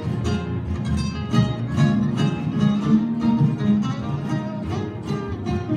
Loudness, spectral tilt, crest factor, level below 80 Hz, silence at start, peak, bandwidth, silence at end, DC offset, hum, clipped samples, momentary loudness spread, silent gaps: -22 LUFS; -7.5 dB/octave; 16 dB; -40 dBFS; 0 s; -6 dBFS; 10 kHz; 0 s; under 0.1%; none; under 0.1%; 8 LU; none